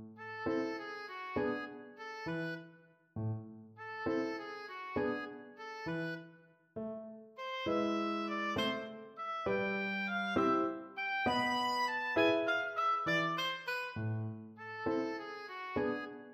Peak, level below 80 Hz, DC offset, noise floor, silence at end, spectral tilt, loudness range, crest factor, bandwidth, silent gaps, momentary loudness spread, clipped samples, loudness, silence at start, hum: -18 dBFS; -70 dBFS; under 0.1%; -62 dBFS; 0 s; -5.5 dB/octave; 8 LU; 20 dB; 15 kHz; none; 14 LU; under 0.1%; -37 LUFS; 0 s; none